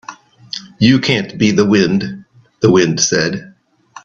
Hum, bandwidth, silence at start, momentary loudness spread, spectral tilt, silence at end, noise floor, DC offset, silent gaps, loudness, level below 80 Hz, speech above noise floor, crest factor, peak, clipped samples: none; 7.6 kHz; 0.1 s; 16 LU; -4.5 dB/octave; 0.05 s; -41 dBFS; under 0.1%; none; -13 LUFS; -50 dBFS; 29 dB; 16 dB; 0 dBFS; under 0.1%